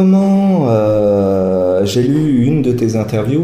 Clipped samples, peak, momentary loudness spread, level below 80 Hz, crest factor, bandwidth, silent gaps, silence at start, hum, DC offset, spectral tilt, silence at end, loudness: under 0.1%; -2 dBFS; 4 LU; -40 dBFS; 10 dB; 14.5 kHz; none; 0 s; none; under 0.1%; -8 dB/octave; 0 s; -13 LUFS